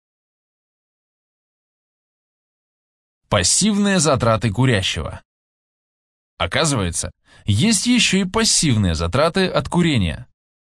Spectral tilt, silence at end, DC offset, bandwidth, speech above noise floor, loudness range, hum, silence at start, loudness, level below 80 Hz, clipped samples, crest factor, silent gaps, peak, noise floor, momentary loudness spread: -4 dB/octave; 0.4 s; under 0.1%; 12 kHz; over 72 dB; 5 LU; none; 3.3 s; -17 LUFS; -42 dBFS; under 0.1%; 20 dB; 5.25-6.37 s; 0 dBFS; under -90 dBFS; 11 LU